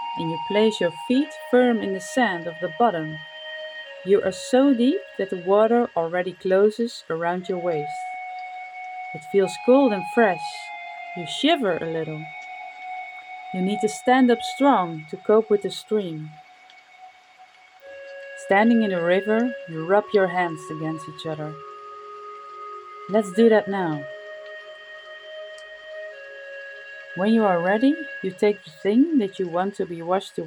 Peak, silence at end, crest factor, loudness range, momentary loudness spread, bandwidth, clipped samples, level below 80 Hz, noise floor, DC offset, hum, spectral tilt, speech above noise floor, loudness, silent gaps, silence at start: -6 dBFS; 0 s; 18 dB; 5 LU; 19 LU; 19.5 kHz; under 0.1%; -74 dBFS; -51 dBFS; under 0.1%; none; -5.5 dB/octave; 29 dB; -22 LUFS; none; 0 s